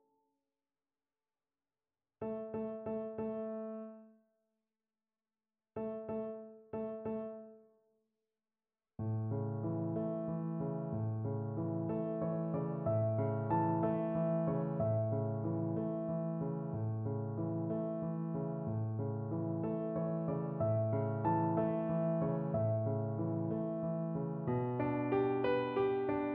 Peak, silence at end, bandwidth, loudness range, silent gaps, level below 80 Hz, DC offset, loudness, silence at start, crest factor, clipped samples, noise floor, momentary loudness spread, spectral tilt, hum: -20 dBFS; 0 s; 4.3 kHz; 10 LU; none; -70 dBFS; under 0.1%; -37 LUFS; 2.2 s; 16 dB; under 0.1%; under -90 dBFS; 9 LU; -9 dB/octave; none